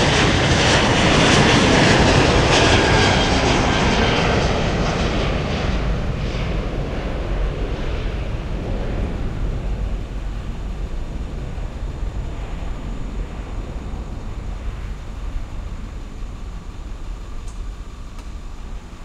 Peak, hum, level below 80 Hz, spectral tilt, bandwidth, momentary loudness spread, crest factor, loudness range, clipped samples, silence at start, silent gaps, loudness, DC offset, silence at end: -2 dBFS; none; -26 dBFS; -4.5 dB/octave; 11 kHz; 21 LU; 18 dB; 19 LU; under 0.1%; 0 s; none; -18 LUFS; under 0.1%; 0 s